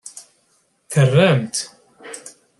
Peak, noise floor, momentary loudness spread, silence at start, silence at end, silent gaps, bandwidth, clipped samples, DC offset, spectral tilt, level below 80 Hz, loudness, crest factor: -2 dBFS; -63 dBFS; 22 LU; 0.05 s; 0.3 s; none; 12.5 kHz; under 0.1%; under 0.1%; -5.5 dB/octave; -60 dBFS; -17 LUFS; 18 dB